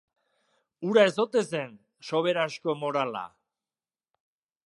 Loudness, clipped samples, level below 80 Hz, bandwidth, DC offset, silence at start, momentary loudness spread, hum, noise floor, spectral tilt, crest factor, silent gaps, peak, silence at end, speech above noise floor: -27 LUFS; under 0.1%; -82 dBFS; 11.5 kHz; under 0.1%; 0.8 s; 17 LU; none; under -90 dBFS; -5 dB/octave; 22 dB; none; -6 dBFS; 1.4 s; over 64 dB